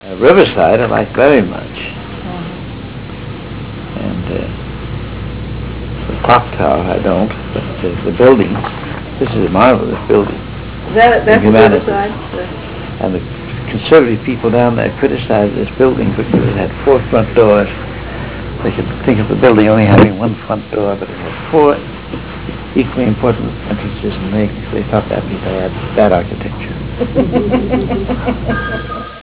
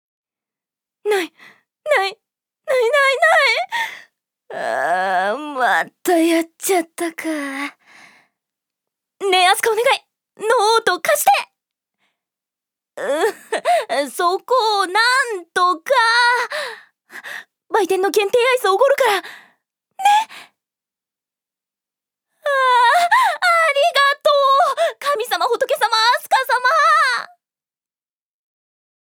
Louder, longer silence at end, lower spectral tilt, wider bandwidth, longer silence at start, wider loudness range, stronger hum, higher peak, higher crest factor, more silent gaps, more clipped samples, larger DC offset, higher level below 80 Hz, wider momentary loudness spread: first, -13 LUFS vs -17 LUFS; second, 0 s vs 1.8 s; first, -11 dB/octave vs -0.5 dB/octave; second, 4 kHz vs over 20 kHz; second, 0 s vs 1.05 s; about the same, 6 LU vs 5 LU; neither; about the same, 0 dBFS vs 0 dBFS; second, 12 dB vs 18 dB; neither; neither; first, 0.8% vs under 0.1%; first, -30 dBFS vs -80 dBFS; about the same, 15 LU vs 13 LU